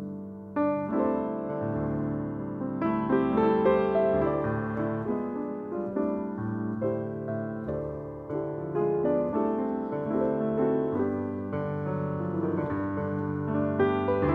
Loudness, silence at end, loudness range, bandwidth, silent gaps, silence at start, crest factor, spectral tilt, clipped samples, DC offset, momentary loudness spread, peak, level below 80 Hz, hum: -29 LUFS; 0 s; 5 LU; 4.8 kHz; none; 0 s; 16 dB; -10.5 dB/octave; under 0.1%; under 0.1%; 8 LU; -12 dBFS; -54 dBFS; none